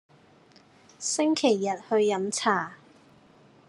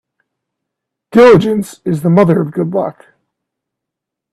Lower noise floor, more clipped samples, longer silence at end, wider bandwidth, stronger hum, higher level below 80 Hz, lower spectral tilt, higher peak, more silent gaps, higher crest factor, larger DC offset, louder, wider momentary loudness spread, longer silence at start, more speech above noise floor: second, -57 dBFS vs -80 dBFS; neither; second, 0.95 s vs 1.4 s; second, 11.5 kHz vs 13.5 kHz; neither; second, -80 dBFS vs -50 dBFS; second, -3.5 dB/octave vs -7.5 dB/octave; second, -8 dBFS vs 0 dBFS; neither; first, 20 dB vs 14 dB; neither; second, -26 LUFS vs -11 LUFS; second, 7 LU vs 12 LU; second, 1 s vs 1.15 s; second, 32 dB vs 70 dB